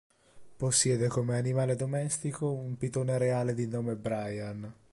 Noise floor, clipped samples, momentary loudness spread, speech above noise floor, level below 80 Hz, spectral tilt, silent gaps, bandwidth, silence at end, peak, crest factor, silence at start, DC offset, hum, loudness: -53 dBFS; under 0.1%; 9 LU; 22 dB; -62 dBFS; -5 dB/octave; none; 11.5 kHz; 0.2 s; -14 dBFS; 18 dB; 0.35 s; under 0.1%; none; -31 LUFS